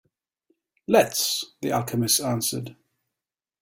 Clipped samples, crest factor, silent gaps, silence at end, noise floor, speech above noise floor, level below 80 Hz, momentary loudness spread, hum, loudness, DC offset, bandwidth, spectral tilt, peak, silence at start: under 0.1%; 22 dB; none; 0.9 s; -89 dBFS; 65 dB; -64 dBFS; 13 LU; none; -23 LUFS; under 0.1%; 17 kHz; -3.5 dB/octave; -4 dBFS; 0.9 s